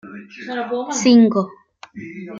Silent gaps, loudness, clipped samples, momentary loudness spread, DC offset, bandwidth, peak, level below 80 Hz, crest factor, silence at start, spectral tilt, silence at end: none; -17 LUFS; under 0.1%; 22 LU; under 0.1%; 7.6 kHz; -2 dBFS; -66 dBFS; 16 dB; 0.05 s; -4.5 dB/octave; 0 s